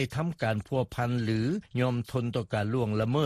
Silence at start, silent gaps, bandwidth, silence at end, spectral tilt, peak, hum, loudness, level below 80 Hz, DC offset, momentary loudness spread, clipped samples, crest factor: 0 s; none; 13.5 kHz; 0 s; -7.5 dB/octave; -14 dBFS; none; -30 LUFS; -56 dBFS; under 0.1%; 3 LU; under 0.1%; 16 dB